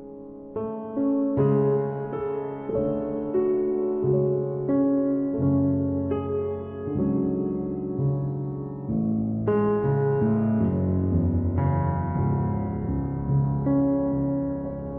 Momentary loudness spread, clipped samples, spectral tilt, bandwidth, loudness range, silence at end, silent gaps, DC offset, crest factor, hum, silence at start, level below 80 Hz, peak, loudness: 8 LU; under 0.1%; -14 dB/octave; 3.1 kHz; 3 LU; 0 s; none; under 0.1%; 14 dB; none; 0 s; -44 dBFS; -10 dBFS; -25 LUFS